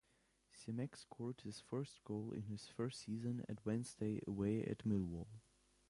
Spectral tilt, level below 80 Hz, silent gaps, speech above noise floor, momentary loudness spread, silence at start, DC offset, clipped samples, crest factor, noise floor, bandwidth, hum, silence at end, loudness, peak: -7 dB/octave; -68 dBFS; none; 34 dB; 9 LU; 0.55 s; under 0.1%; under 0.1%; 18 dB; -78 dBFS; 11.5 kHz; none; 0.5 s; -45 LUFS; -28 dBFS